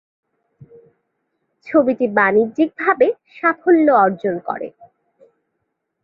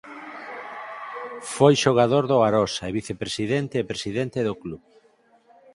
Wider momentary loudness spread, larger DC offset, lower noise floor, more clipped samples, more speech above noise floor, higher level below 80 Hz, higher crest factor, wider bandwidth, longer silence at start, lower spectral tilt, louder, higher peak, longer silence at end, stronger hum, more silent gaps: second, 11 LU vs 18 LU; neither; first, -74 dBFS vs -59 dBFS; neither; first, 58 dB vs 37 dB; second, -66 dBFS vs -56 dBFS; about the same, 18 dB vs 22 dB; second, 5.2 kHz vs 11.5 kHz; first, 1.65 s vs 0.05 s; first, -9 dB/octave vs -5.5 dB/octave; first, -17 LUFS vs -22 LUFS; about the same, -2 dBFS vs -2 dBFS; first, 1.35 s vs 1 s; neither; neither